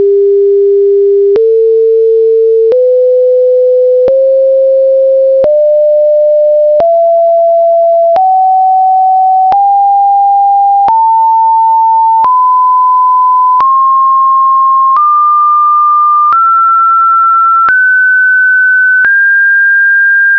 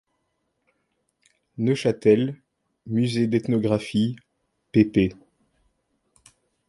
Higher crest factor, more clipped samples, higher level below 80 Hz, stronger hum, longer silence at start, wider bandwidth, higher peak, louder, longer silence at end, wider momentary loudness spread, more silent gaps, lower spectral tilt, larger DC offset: second, 2 dB vs 20 dB; neither; about the same, -54 dBFS vs -54 dBFS; first, 50 Hz at -65 dBFS vs none; second, 0 s vs 1.6 s; second, 5.4 kHz vs 11.5 kHz; about the same, -4 dBFS vs -4 dBFS; first, -6 LUFS vs -23 LUFS; second, 0 s vs 1.55 s; second, 2 LU vs 10 LU; neither; about the same, -6.5 dB/octave vs -7.5 dB/octave; first, 0.4% vs under 0.1%